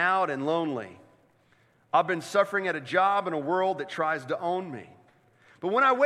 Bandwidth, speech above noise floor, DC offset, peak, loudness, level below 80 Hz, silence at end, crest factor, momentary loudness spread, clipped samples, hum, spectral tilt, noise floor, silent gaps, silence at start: 13 kHz; 38 dB; under 0.1%; -10 dBFS; -27 LUFS; -80 dBFS; 0 s; 18 dB; 11 LU; under 0.1%; none; -5 dB/octave; -64 dBFS; none; 0 s